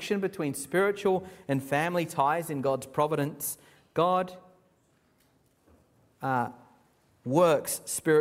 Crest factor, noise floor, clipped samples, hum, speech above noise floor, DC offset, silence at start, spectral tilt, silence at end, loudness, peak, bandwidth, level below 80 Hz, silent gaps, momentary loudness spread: 20 dB; -67 dBFS; under 0.1%; none; 40 dB; under 0.1%; 0 s; -5 dB/octave; 0 s; -29 LUFS; -10 dBFS; 16 kHz; -70 dBFS; none; 10 LU